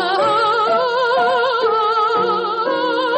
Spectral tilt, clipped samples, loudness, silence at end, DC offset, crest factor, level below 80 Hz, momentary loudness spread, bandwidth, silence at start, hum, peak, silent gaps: -4 dB/octave; under 0.1%; -16 LUFS; 0 s; under 0.1%; 10 dB; -66 dBFS; 3 LU; 8.6 kHz; 0 s; none; -6 dBFS; none